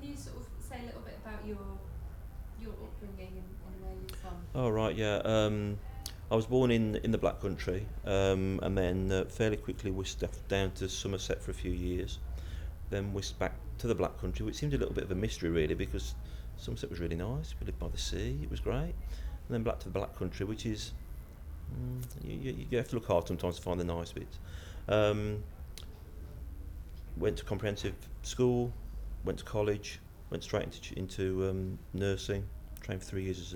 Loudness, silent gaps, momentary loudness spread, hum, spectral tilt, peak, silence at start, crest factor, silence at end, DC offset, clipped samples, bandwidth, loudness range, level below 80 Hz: -35 LUFS; none; 16 LU; none; -6 dB/octave; -16 dBFS; 0 s; 20 dB; 0 s; under 0.1%; under 0.1%; 19 kHz; 7 LU; -44 dBFS